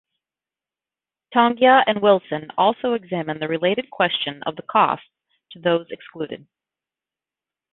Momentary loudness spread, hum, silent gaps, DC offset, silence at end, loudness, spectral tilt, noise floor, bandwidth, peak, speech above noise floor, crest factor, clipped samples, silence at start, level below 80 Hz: 16 LU; none; none; under 0.1%; 1.4 s; -20 LUFS; -9.5 dB/octave; under -90 dBFS; 4.1 kHz; -2 dBFS; over 70 dB; 20 dB; under 0.1%; 1.3 s; -68 dBFS